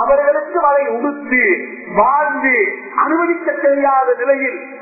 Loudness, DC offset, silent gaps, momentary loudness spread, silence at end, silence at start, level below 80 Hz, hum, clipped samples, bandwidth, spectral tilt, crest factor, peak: -15 LUFS; under 0.1%; none; 5 LU; 0 s; 0 s; -54 dBFS; none; under 0.1%; 2.7 kHz; -14 dB/octave; 14 dB; 0 dBFS